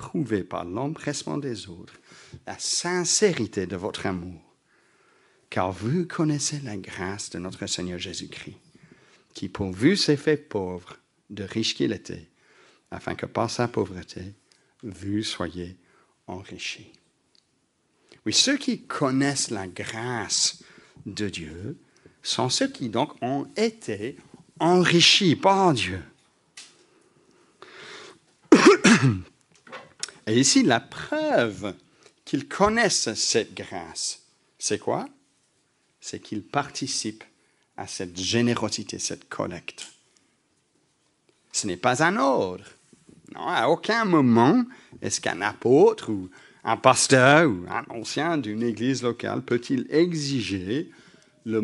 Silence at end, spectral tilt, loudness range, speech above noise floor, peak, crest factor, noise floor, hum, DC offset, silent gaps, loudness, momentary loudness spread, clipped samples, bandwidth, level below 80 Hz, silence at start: 0 s; -4 dB/octave; 10 LU; 45 dB; 0 dBFS; 26 dB; -70 dBFS; none; under 0.1%; none; -24 LUFS; 21 LU; under 0.1%; 11.5 kHz; -62 dBFS; 0 s